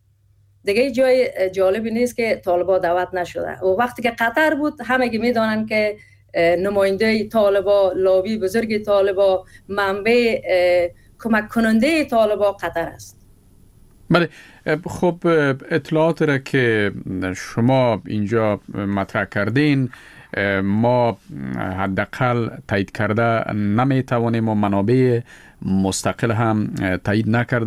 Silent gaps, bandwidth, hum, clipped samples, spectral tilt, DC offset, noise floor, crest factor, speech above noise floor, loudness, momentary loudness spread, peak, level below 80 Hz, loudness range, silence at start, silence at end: none; 16 kHz; none; under 0.1%; -6.5 dB/octave; under 0.1%; -56 dBFS; 18 dB; 38 dB; -19 LUFS; 8 LU; -2 dBFS; -50 dBFS; 3 LU; 0.65 s; 0 s